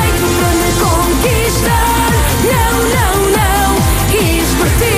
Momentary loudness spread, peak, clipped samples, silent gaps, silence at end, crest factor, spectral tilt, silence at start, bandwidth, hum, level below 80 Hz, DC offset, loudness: 1 LU; 0 dBFS; under 0.1%; none; 0 s; 10 dB; -4.5 dB/octave; 0 s; 16 kHz; none; -18 dBFS; under 0.1%; -12 LUFS